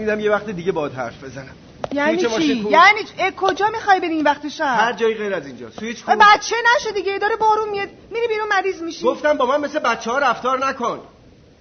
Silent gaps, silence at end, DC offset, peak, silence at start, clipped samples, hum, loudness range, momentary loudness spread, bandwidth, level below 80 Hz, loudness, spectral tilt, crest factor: none; 0.55 s; under 0.1%; -2 dBFS; 0 s; under 0.1%; none; 3 LU; 15 LU; 6.6 kHz; -54 dBFS; -18 LUFS; -1.5 dB/octave; 18 dB